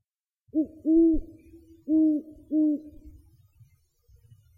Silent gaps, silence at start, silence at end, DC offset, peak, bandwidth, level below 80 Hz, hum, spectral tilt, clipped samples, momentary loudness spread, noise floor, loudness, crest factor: none; 0.55 s; 1.5 s; under 0.1%; -14 dBFS; 1 kHz; -46 dBFS; none; -11.5 dB/octave; under 0.1%; 11 LU; -70 dBFS; -26 LUFS; 14 dB